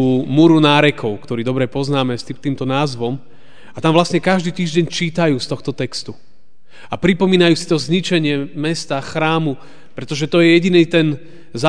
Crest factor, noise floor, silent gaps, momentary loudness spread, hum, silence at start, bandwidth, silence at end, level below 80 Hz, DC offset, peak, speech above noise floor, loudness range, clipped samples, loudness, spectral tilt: 16 dB; -52 dBFS; none; 12 LU; none; 0 s; 10 kHz; 0 s; -52 dBFS; 2%; 0 dBFS; 36 dB; 3 LU; under 0.1%; -16 LUFS; -6 dB/octave